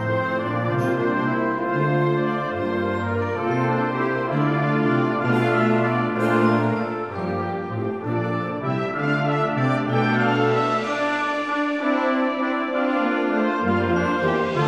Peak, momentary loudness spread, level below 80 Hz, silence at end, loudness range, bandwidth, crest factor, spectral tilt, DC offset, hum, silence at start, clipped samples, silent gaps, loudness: -6 dBFS; 6 LU; -60 dBFS; 0 s; 3 LU; 12 kHz; 14 dB; -7.5 dB/octave; 0.1%; none; 0 s; under 0.1%; none; -22 LUFS